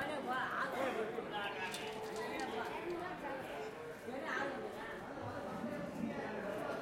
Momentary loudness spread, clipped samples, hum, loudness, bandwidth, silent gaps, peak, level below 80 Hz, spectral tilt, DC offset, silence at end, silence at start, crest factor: 7 LU; under 0.1%; none; -42 LUFS; 16.5 kHz; none; -24 dBFS; -70 dBFS; -4.5 dB/octave; under 0.1%; 0 s; 0 s; 18 dB